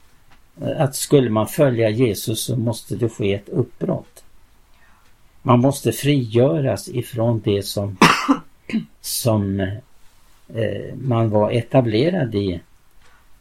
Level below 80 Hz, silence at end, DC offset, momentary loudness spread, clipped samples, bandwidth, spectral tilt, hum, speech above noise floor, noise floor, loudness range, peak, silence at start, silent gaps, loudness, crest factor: -52 dBFS; 0.05 s; under 0.1%; 11 LU; under 0.1%; 16.5 kHz; -5.5 dB/octave; none; 31 dB; -49 dBFS; 4 LU; 0 dBFS; 0.55 s; none; -20 LUFS; 20 dB